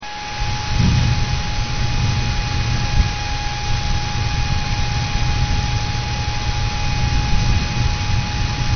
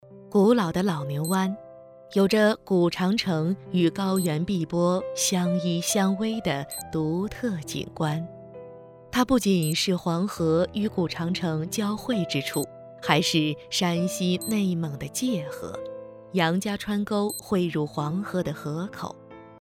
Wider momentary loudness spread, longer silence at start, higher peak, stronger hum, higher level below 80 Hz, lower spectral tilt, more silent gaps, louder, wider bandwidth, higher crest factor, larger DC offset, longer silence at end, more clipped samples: second, 4 LU vs 11 LU; about the same, 0 s vs 0.05 s; about the same, -4 dBFS vs -4 dBFS; neither; first, -22 dBFS vs -56 dBFS; about the same, -4 dB/octave vs -5 dB/octave; neither; first, -21 LUFS vs -26 LUFS; second, 6.6 kHz vs 17.5 kHz; second, 16 dB vs 22 dB; neither; second, 0 s vs 0.15 s; neither